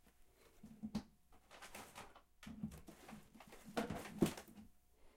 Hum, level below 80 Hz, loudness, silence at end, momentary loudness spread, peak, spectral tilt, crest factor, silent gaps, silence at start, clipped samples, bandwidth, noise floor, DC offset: none; -66 dBFS; -47 LUFS; 0 s; 23 LU; -20 dBFS; -5.5 dB/octave; 28 dB; none; 0.05 s; under 0.1%; 16 kHz; -68 dBFS; under 0.1%